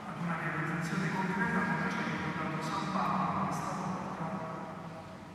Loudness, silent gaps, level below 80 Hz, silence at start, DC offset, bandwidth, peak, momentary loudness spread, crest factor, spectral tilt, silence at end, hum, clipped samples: -34 LUFS; none; -64 dBFS; 0 s; under 0.1%; 14 kHz; -18 dBFS; 10 LU; 16 dB; -6 dB/octave; 0 s; none; under 0.1%